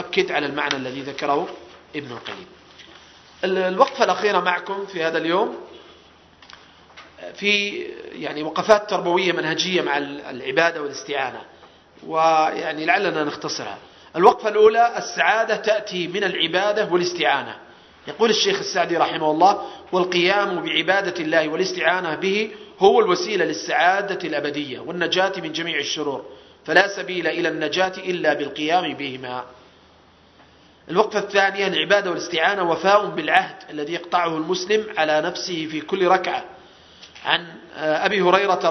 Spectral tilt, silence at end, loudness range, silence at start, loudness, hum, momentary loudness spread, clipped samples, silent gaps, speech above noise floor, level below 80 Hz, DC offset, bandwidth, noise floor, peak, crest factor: -3.5 dB/octave; 0 s; 6 LU; 0 s; -20 LUFS; none; 13 LU; under 0.1%; none; 32 dB; -64 dBFS; under 0.1%; 6.4 kHz; -52 dBFS; 0 dBFS; 22 dB